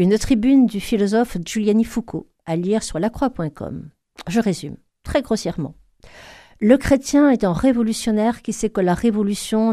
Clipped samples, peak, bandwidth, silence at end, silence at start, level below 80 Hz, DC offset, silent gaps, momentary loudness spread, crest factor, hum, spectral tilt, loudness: under 0.1%; 0 dBFS; 14.5 kHz; 0 s; 0 s; -40 dBFS; under 0.1%; none; 15 LU; 20 dB; none; -6 dB/octave; -19 LUFS